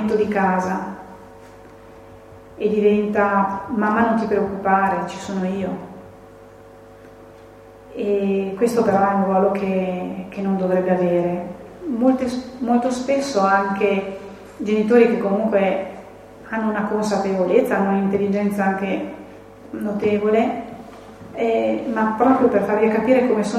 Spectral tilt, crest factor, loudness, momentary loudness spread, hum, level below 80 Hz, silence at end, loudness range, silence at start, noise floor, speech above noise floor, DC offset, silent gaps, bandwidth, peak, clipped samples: -7 dB/octave; 18 dB; -20 LUFS; 16 LU; none; -54 dBFS; 0 s; 4 LU; 0 s; -43 dBFS; 24 dB; under 0.1%; none; 13 kHz; -2 dBFS; under 0.1%